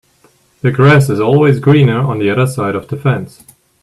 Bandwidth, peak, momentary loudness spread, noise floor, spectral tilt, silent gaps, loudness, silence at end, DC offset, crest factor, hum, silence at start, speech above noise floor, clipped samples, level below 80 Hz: 12.5 kHz; 0 dBFS; 10 LU; -52 dBFS; -7.5 dB/octave; none; -12 LUFS; 0.55 s; under 0.1%; 12 dB; none; 0.65 s; 41 dB; under 0.1%; -48 dBFS